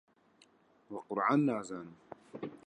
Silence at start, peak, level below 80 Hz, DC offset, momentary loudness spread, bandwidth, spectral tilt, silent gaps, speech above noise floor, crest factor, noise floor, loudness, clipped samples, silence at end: 0.9 s; -16 dBFS; -82 dBFS; under 0.1%; 22 LU; 9.6 kHz; -7 dB/octave; none; 33 dB; 20 dB; -67 dBFS; -34 LUFS; under 0.1%; 0.1 s